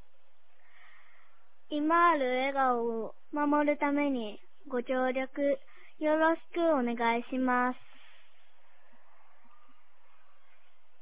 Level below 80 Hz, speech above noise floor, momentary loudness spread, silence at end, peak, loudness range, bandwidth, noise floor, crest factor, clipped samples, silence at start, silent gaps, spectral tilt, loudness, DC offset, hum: -72 dBFS; 43 dB; 11 LU; 3.25 s; -14 dBFS; 6 LU; 4 kHz; -72 dBFS; 18 dB; under 0.1%; 1.7 s; none; -2 dB/octave; -30 LUFS; 0.8%; none